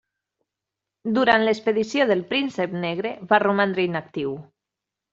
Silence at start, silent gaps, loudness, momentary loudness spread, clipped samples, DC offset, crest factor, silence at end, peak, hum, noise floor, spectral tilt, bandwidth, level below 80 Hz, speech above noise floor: 1.05 s; none; -22 LUFS; 11 LU; under 0.1%; under 0.1%; 20 dB; 0.7 s; -2 dBFS; none; -86 dBFS; -3 dB/octave; 7.8 kHz; -66 dBFS; 64 dB